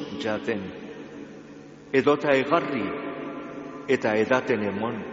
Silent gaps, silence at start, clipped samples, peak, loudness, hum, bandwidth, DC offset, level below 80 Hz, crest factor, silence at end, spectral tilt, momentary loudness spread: none; 0 s; under 0.1%; -6 dBFS; -25 LUFS; none; 7.6 kHz; under 0.1%; -64 dBFS; 20 dB; 0 s; -4 dB/octave; 19 LU